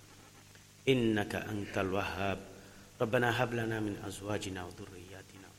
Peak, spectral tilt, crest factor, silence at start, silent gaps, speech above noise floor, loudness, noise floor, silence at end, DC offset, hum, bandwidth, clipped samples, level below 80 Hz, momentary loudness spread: -14 dBFS; -5.5 dB/octave; 22 dB; 0 s; none; 23 dB; -34 LUFS; -57 dBFS; 0.05 s; under 0.1%; none; 16 kHz; under 0.1%; -60 dBFS; 22 LU